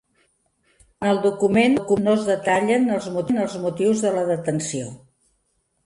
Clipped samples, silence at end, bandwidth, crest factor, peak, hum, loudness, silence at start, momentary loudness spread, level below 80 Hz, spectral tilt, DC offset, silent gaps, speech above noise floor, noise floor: under 0.1%; 0.9 s; 11.5 kHz; 16 dB; -6 dBFS; none; -21 LUFS; 1 s; 8 LU; -60 dBFS; -5.5 dB/octave; under 0.1%; none; 49 dB; -70 dBFS